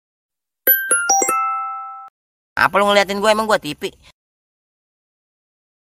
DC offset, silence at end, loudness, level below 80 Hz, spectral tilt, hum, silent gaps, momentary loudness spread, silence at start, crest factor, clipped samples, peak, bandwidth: under 0.1%; 2 s; -16 LUFS; -56 dBFS; -1.5 dB/octave; none; 2.10-2.56 s; 15 LU; 0.65 s; 20 dB; under 0.1%; 0 dBFS; 16.5 kHz